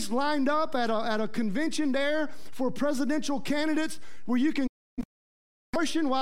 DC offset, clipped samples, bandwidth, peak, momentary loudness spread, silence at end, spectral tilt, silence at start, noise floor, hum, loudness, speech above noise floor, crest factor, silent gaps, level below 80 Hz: 3%; under 0.1%; 15.5 kHz; -14 dBFS; 9 LU; 0 s; -4 dB/octave; 0 s; under -90 dBFS; none; -29 LUFS; over 62 dB; 14 dB; 4.69-4.97 s, 5.05-5.73 s; -54 dBFS